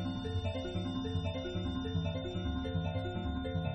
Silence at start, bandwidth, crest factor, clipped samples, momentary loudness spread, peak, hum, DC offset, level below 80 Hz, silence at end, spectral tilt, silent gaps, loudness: 0 s; 8.4 kHz; 14 dB; under 0.1%; 1 LU; -22 dBFS; none; under 0.1%; -46 dBFS; 0 s; -7.5 dB/octave; none; -37 LUFS